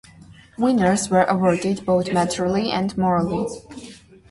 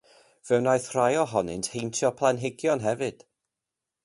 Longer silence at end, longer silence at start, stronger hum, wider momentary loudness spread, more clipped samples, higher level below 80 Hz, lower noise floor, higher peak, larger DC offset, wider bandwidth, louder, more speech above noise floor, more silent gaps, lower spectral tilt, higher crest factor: second, 0.35 s vs 0.95 s; second, 0.3 s vs 0.45 s; neither; first, 11 LU vs 7 LU; neither; first, -50 dBFS vs -62 dBFS; second, -46 dBFS vs -87 dBFS; first, -4 dBFS vs -8 dBFS; neither; about the same, 11.5 kHz vs 11.5 kHz; first, -20 LUFS vs -26 LUFS; second, 26 dB vs 62 dB; neither; about the same, -5.5 dB/octave vs -4.5 dB/octave; about the same, 16 dB vs 20 dB